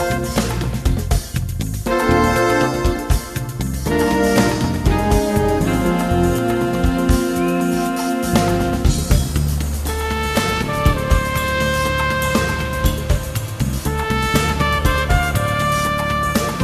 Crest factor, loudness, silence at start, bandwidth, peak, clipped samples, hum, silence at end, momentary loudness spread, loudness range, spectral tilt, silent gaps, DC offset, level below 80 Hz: 18 dB; -18 LUFS; 0 s; 14 kHz; 0 dBFS; under 0.1%; none; 0 s; 5 LU; 2 LU; -5.5 dB/octave; none; under 0.1%; -24 dBFS